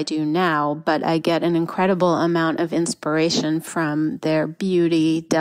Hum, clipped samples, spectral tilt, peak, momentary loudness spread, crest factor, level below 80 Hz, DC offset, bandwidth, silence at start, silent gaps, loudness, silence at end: none; under 0.1%; -5.5 dB/octave; -6 dBFS; 4 LU; 14 dB; -64 dBFS; under 0.1%; 14.5 kHz; 0 s; none; -20 LUFS; 0 s